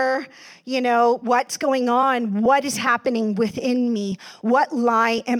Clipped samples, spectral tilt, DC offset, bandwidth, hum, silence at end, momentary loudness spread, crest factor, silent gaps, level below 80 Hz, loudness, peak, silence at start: under 0.1%; -4.5 dB/octave; under 0.1%; 17 kHz; none; 0 s; 9 LU; 14 dB; none; -66 dBFS; -20 LUFS; -6 dBFS; 0 s